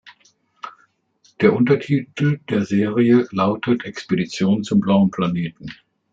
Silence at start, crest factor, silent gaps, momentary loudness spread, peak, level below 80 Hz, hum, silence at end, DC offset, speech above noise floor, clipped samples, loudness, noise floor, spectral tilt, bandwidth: 0.05 s; 18 dB; none; 21 LU; -2 dBFS; -60 dBFS; none; 0.4 s; under 0.1%; 42 dB; under 0.1%; -19 LUFS; -60 dBFS; -7.5 dB/octave; 7.6 kHz